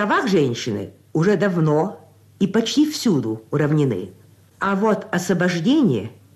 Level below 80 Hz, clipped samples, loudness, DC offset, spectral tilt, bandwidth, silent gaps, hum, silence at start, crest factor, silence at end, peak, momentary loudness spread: -62 dBFS; under 0.1%; -20 LUFS; under 0.1%; -6 dB/octave; 13.5 kHz; none; none; 0 s; 12 dB; 0.25 s; -8 dBFS; 9 LU